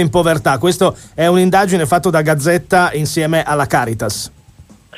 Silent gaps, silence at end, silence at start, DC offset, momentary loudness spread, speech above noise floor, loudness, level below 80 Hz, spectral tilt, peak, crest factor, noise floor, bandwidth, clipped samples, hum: none; 0.35 s; 0 s; under 0.1%; 6 LU; 30 dB; -14 LUFS; -42 dBFS; -5 dB/octave; 0 dBFS; 14 dB; -43 dBFS; 15.5 kHz; under 0.1%; none